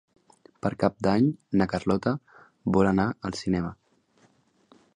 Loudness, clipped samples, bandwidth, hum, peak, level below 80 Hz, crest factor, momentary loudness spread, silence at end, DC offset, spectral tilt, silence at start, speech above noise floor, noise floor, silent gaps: -26 LUFS; under 0.1%; 10 kHz; none; -6 dBFS; -52 dBFS; 20 dB; 9 LU; 1.25 s; under 0.1%; -7.5 dB/octave; 0.65 s; 39 dB; -64 dBFS; none